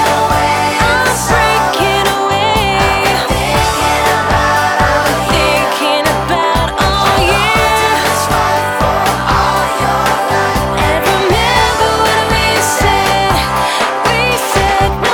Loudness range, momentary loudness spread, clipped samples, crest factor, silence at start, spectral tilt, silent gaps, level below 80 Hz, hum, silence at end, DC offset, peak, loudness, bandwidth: 1 LU; 3 LU; under 0.1%; 12 dB; 0 s; -3.5 dB/octave; none; -26 dBFS; none; 0 s; under 0.1%; 0 dBFS; -11 LUFS; over 20 kHz